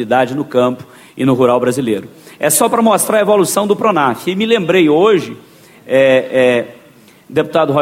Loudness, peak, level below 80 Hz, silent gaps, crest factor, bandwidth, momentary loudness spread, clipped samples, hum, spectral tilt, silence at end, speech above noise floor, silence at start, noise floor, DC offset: -13 LUFS; 0 dBFS; -56 dBFS; none; 14 dB; 16.5 kHz; 8 LU; under 0.1%; none; -4.5 dB/octave; 0 s; 31 dB; 0 s; -44 dBFS; under 0.1%